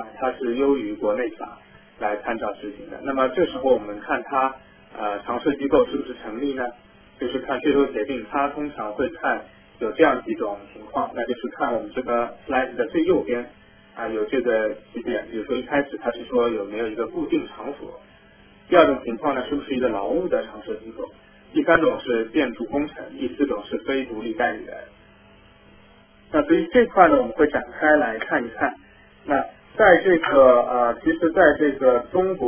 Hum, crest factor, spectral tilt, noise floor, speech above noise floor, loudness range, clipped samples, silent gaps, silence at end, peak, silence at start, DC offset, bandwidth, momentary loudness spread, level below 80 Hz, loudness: none; 22 dB; -9 dB/octave; -52 dBFS; 30 dB; 7 LU; under 0.1%; none; 0 s; 0 dBFS; 0 s; under 0.1%; 3.5 kHz; 15 LU; -52 dBFS; -22 LUFS